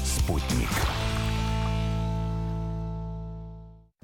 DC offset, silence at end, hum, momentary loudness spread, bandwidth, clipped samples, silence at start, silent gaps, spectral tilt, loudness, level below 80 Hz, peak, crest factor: under 0.1%; 0.25 s; none; 12 LU; 18 kHz; under 0.1%; 0 s; none; -5 dB/octave; -29 LUFS; -32 dBFS; -14 dBFS; 14 dB